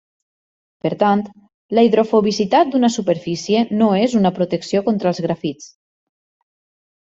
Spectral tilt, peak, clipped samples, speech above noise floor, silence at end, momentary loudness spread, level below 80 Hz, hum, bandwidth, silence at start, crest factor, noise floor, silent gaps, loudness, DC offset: -6 dB/octave; -2 dBFS; under 0.1%; over 73 dB; 1.35 s; 10 LU; -60 dBFS; none; 7.8 kHz; 0.85 s; 16 dB; under -90 dBFS; 1.54-1.69 s; -17 LUFS; under 0.1%